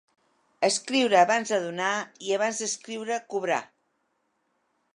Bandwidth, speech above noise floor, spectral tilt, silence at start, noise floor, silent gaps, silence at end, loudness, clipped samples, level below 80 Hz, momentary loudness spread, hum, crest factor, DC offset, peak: 11 kHz; 48 dB; -2.5 dB/octave; 0.6 s; -74 dBFS; none; 1.3 s; -26 LUFS; under 0.1%; -84 dBFS; 10 LU; none; 20 dB; under 0.1%; -8 dBFS